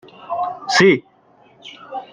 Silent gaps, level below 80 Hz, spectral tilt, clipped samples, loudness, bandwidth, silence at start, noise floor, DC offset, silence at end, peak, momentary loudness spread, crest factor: none; -64 dBFS; -4.5 dB/octave; under 0.1%; -17 LUFS; 9.8 kHz; 0.2 s; -52 dBFS; under 0.1%; 0.1 s; -2 dBFS; 23 LU; 18 dB